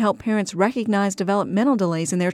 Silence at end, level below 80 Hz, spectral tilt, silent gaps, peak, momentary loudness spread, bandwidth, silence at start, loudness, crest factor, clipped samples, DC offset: 0 s; -62 dBFS; -5.5 dB/octave; none; -6 dBFS; 3 LU; 13.5 kHz; 0 s; -21 LUFS; 14 dB; under 0.1%; under 0.1%